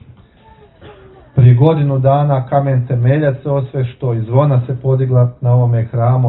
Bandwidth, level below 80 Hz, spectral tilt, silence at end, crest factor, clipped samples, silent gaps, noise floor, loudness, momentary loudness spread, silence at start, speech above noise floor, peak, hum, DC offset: 4.1 kHz; -44 dBFS; -13 dB/octave; 0 s; 14 dB; under 0.1%; none; -44 dBFS; -14 LUFS; 8 LU; 0.85 s; 31 dB; 0 dBFS; none; under 0.1%